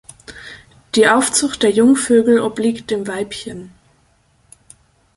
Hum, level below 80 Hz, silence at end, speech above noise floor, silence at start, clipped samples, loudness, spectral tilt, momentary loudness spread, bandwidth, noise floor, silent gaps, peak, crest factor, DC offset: none; -54 dBFS; 1.5 s; 42 dB; 0.3 s; under 0.1%; -15 LUFS; -3 dB/octave; 23 LU; 11.5 kHz; -57 dBFS; none; -2 dBFS; 16 dB; under 0.1%